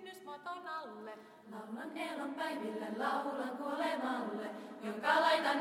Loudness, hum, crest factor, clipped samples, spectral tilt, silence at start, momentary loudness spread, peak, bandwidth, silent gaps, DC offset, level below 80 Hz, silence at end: -37 LUFS; none; 20 dB; under 0.1%; -4 dB/octave; 0 s; 18 LU; -18 dBFS; 16.5 kHz; none; under 0.1%; -86 dBFS; 0 s